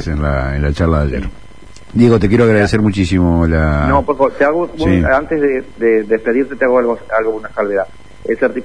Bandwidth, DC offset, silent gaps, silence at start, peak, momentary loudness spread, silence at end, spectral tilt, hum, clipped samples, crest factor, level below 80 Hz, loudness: 10.5 kHz; 2%; none; 0 s; 0 dBFS; 9 LU; 0 s; -8 dB/octave; none; under 0.1%; 14 dB; -26 dBFS; -14 LUFS